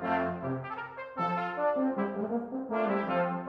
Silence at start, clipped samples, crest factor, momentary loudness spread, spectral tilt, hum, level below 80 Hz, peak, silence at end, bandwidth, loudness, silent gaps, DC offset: 0 s; under 0.1%; 14 dB; 7 LU; -9 dB/octave; none; -68 dBFS; -18 dBFS; 0 s; 6 kHz; -32 LUFS; none; under 0.1%